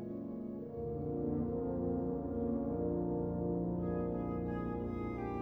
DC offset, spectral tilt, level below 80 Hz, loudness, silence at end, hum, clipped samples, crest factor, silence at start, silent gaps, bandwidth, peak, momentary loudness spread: under 0.1%; -12 dB/octave; -52 dBFS; -38 LUFS; 0 s; none; under 0.1%; 12 dB; 0 s; none; 4 kHz; -26 dBFS; 6 LU